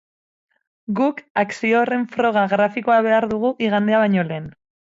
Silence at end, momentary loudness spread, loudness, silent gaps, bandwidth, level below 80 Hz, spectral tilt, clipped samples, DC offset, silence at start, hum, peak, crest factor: 0.35 s; 10 LU; -19 LUFS; 1.30-1.35 s; 7.8 kHz; -62 dBFS; -7 dB/octave; under 0.1%; under 0.1%; 0.9 s; none; -4 dBFS; 14 dB